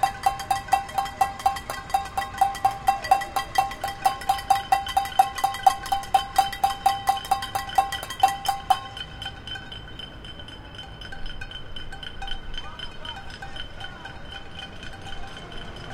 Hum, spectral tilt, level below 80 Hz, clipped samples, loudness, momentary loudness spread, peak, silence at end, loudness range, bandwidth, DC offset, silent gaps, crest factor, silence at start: none; -2.5 dB/octave; -42 dBFS; under 0.1%; -25 LUFS; 16 LU; -4 dBFS; 0 s; 13 LU; 17 kHz; under 0.1%; none; 22 dB; 0 s